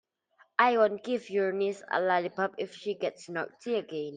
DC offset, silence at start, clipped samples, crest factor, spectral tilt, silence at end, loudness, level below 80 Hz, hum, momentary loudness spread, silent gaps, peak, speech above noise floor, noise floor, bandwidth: under 0.1%; 0.6 s; under 0.1%; 22 dB; -5 dB/octave; 0 s; -30 LUFS; -82 dBFS; none; 11 LU; none; -8 dBFS; 36 dB; -66 dBFS; 9.6 kHz